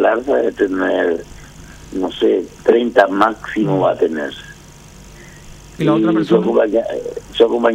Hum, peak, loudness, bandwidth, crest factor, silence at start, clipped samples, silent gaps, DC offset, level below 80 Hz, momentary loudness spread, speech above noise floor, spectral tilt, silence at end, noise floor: none; 0 dBFS; -16 LUFS; 12 kHz; 16 dB; 0 s; under 0.1%; none; under 0.1%; -46 dBFS; 12 LU; 24 dB; -6.5 dB/octave; 0 s; -39 dBFS